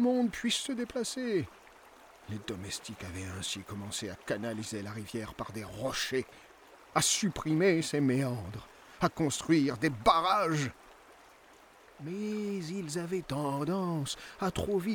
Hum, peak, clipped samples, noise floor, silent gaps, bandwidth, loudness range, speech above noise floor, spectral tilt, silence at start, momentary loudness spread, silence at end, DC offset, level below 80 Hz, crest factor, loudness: none; -10 dBFS; under 0.1%; -58 dBFS; none; over 20 kHz; 9 LU; 26 dB; -4.5 dB/octave; 0 s; 13 LU; 0 s; under 0.1%; -60 dBFS; 22 dB; -32 LUFS